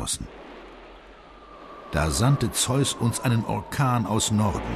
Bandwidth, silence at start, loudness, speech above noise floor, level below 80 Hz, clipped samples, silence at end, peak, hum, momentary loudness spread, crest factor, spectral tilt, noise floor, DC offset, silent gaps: 14 kHz; 0 s; -24 LUFS; 23 dB; -40 dBFS; under 0.1%; 0 s; -10 dBFS; none; 21 LU; 16 dB; -4.5 dB/octave; -47 dBFS; under 0.1%; none